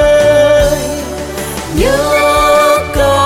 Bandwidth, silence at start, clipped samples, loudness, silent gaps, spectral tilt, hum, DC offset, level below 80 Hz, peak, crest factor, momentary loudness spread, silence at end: 16.5 kHz; 0 s; under 0.1%; -11 LUFS; none; -4 dB/octave; none; under 0.1%; -24 dBFS; 0 dBFS; 10 dB; 12 LU; 0 s